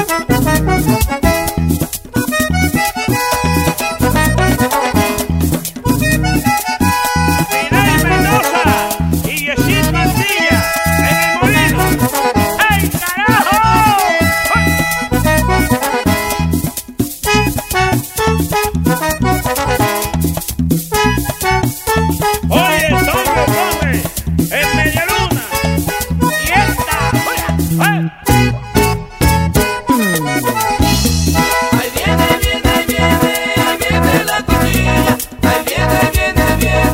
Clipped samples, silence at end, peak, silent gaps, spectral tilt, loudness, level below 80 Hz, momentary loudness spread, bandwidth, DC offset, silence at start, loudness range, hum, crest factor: under 0.1%; 0 s; 0 dBFS; none; -4.5 dB/octave; -13 LUFS; -24 dBFS; 4 LU; 16.5 kHz; under 0.1%; 0 s; 3 LU; none; 14 dB